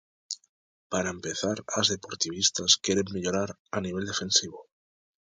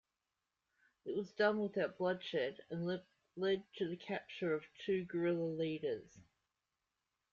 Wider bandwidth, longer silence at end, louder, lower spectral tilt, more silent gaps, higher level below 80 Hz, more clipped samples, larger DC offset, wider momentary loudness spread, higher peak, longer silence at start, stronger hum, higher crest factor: first, 10.5 kHz vs 7.2 kHz; second, 0.7 s vs 1.1 s; first, -27 LUFS vs -40 LUFS; second, -2 dB/octave vs -4.5 dB/octave; first, 0.49-0.90 s, 3.59-3.65 s vs none; first, -58 dBFS vs -80 dBFS; neither; neither; first, 15 LU vs 9 LU; first, -6 dBFS vs -20 dBFS; second, 0.3 s vs 1.05 s; neither; about the same, 24 dB vs 20 dB